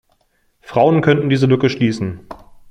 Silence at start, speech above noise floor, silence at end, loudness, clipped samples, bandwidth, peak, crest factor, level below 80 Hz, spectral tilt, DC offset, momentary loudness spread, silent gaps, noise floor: 0.7 s; 47 dB; 0.35 s; -16 LUFS; under 0.1%; 9.6 kHz; 0 dBFS; 16 dB; -50 dBFS; -7.5 dB/octave; under 0.1%; 12 LU; none; -61 dBFS